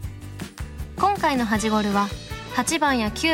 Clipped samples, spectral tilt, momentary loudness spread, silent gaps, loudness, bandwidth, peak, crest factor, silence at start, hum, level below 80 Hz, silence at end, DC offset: under 0.1%; -4 dB/octave; 15 LU; none; -22 LUFS; 17 kHz; -6 dBFS; 18 dB; 0 s; none; -40 dBFS; 0 s; under 0.1%